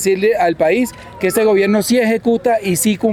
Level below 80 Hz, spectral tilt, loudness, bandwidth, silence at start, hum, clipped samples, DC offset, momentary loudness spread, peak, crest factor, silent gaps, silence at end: -50 dBFS; -4.5 dB/octave; -15 LUFS; 18.5 kHz; 0 s; none; under 0.1%; under 0.1%; 5 LU; -4 dBFS; 10 dB; none; 0 s